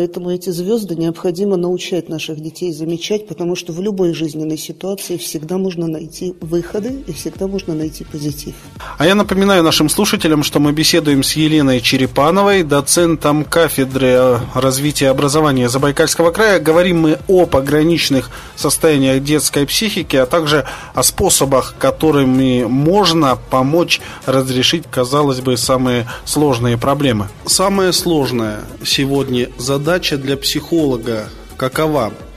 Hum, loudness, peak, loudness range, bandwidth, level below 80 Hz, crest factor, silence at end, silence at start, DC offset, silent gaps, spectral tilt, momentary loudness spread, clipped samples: none; -14 LUFS; 0 dBFS; 8 LU; 15.5 kHz; -38 dBFS; 14 dB; 0 s; 0 s; under 0.1%; none; -4.5 dB/octave; 11 LU; under 0.1%